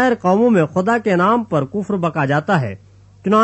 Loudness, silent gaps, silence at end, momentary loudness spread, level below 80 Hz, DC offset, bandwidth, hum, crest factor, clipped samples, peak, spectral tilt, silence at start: -17 LUFS; none; 0 s; 8 LU; -56 dBFS; under 0.1%; 8.4 kHz; none; 14 dB; under 0.1%; -2 dBFS; -7.5 dB/octave; 0 s